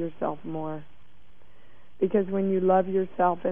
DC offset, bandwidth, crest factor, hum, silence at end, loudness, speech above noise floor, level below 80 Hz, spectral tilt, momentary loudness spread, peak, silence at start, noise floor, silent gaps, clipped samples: 1%; 3.6 kHz; 16 dB; none; 0 s; -26 LUFS; 33 dB; -60 dBFS; -11 dB/octave; 12 LU; -10 dBFS; 0 s; -59 dBFS; none; under 0.1%